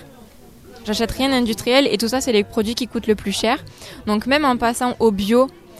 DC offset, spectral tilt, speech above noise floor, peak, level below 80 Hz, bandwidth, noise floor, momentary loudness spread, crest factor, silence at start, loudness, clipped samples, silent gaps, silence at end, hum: 0.1%; -4 dB/octave; 25 dB; 0 dBFS; -42 dBFS; 15.5 kHz; -44 dBFS; 7 LU; 18 dB; 0 s; -19 LUFS; under 0.1%; none; 0 s; none